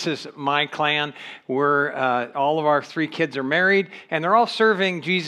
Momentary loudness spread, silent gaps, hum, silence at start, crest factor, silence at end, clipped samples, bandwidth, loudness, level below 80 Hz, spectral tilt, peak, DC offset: 9 LU; none; none; 0 s; 16 dB; 0 s; under 0.1%; 11.5 kHz; -21 LUFS; -84 dBFS; -5 dB/octave; -6 dBFS; under 0.1%